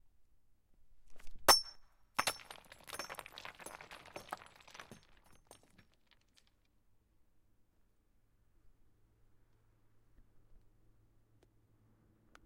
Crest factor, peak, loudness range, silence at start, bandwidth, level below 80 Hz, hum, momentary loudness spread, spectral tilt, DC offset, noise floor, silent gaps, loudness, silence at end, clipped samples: 30 dB; -14 dBFS; 20 LU; 0.85 s; 16 kHz; -64 dBFS; none; 26 LU; 0 dB/octave; under 0.1%; -72 dBFS; none; -33 LUFS; 1.9 s; under 0.1%